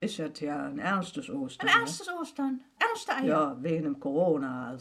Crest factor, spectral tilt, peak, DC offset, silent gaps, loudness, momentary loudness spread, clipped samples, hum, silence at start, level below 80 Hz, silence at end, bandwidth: 20 dB; -4.5 dB/octave; -10 dBFS; under 0.1%; none; -30 LUFS; 11 LU; under 0.1%; none; 0 s; -72 dBFS; 0 s; 14.5 kHz